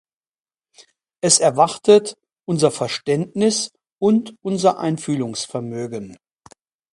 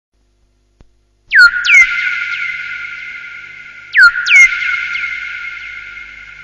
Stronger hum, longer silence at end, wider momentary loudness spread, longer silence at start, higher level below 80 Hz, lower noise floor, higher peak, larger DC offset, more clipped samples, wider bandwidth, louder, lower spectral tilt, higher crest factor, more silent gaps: neither; first, 0.8 s vs 0 s; second, 15 LU vs 23 LU; about the same, 1.25 s vs 1.3 s; second, -64 dBFS vs -50 dBFS; first, under -90 dBFS vs -57 dBFS; about the same, 0 dBFS vs 0 dBFS; neither; neither; about the same, 11.5 kHz vs 12.5 kHz; second, -19 LUFS vs -9 LUFS; first, -4 dB/octave vs 2.5 dB/octave; first, 20 dB vs 14 dB; first, 3.92-3.98 s vs none